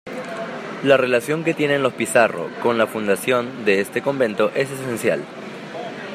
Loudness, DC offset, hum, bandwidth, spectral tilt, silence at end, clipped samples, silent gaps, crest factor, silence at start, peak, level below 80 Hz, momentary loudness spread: -20 LUFS; under 0.1%; none; 15.5 kHz; -4.5 dB/octave; 0 s; under 0.1%; none; 20 dB; 0.05 s; -2 dBFS; -68 dBFS; 13 LU